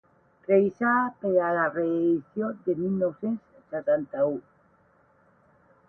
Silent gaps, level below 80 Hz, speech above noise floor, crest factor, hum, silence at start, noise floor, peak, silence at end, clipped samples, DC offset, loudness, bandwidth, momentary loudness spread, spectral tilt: none; -70 dBFS; 37 dB; 18 dB; none; 0.5 s; -62 dBFS; -10 dBFS; 1.5 s; under 0.1%; under 0.1%; -26 LUFS; 3.4 kHz; 9 LU; -10.5 dB/octave